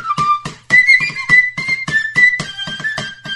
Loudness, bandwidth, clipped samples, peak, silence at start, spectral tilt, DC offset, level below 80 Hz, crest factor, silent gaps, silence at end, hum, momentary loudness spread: -12 LUFS; 11.5 kHz; under 0.1%; 0 dBFS; 0 s; -2.5 dB/octave; under 0.1%; -50 dBFS; 14 dB; none; 0 s; none; 12 LU